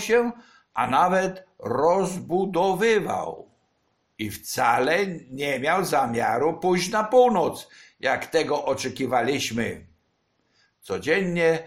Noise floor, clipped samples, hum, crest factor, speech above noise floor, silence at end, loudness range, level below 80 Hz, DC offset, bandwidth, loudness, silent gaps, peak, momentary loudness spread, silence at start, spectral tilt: -70 dBFS; under 0.1%; none; 18 dB; 47 dB; 0 s; 4 LU; -58 dBFS; under 0.1%; 16 kHz; -23 LUFS; none; -6 dBFS; 11 LU; 0 s; -4.5 dB/octave